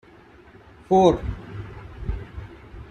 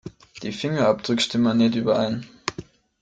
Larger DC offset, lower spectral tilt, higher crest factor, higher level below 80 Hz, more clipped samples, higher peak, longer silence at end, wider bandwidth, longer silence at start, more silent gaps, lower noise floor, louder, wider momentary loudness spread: neither; first, -7.5 dB/octave vs -5.5 dB/octave; about the same, 22 dB vs 20 dB; first, -38 dBFS vs -58 dBFS; neither; about the same, -4 dBFS vs -4 dBFS; second, 0.05 s vs 0.4 s; about the same, 9.6 kHz vs 9.2 kHz; first, 0.9 s vs 0.05 s; neither; first, -49 dBFS vs -42 dBFS; about the same, -22 LUFS vs -23 LUFS; first, 23 LU vs 14 LU